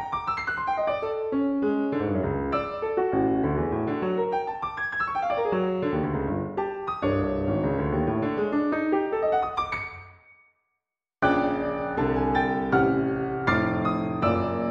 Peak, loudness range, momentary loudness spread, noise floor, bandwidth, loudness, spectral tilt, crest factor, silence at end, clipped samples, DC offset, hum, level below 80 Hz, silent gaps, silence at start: -10 dBFS; 3 LU; 5 LU; -84 dBFS; 7 kHz; -26 LUFS; -8.5 dB/octave; 16 dB; 0 s; under 0.1%; under 0.1%; none; -46 dBFS; none; 0 s